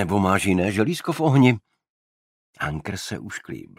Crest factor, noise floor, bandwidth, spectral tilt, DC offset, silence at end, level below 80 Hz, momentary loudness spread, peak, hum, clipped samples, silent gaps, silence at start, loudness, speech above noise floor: 20 dB; under -90 dBFS; 15.5 kHz; -6 dB/octave; under 0.1%; 0.15 s; -52 dBFS; 15 LU; -2 dBFS; none; under 0.1%; 1.89-2.53 s; 0 s; -22 LUFS; over 68 dB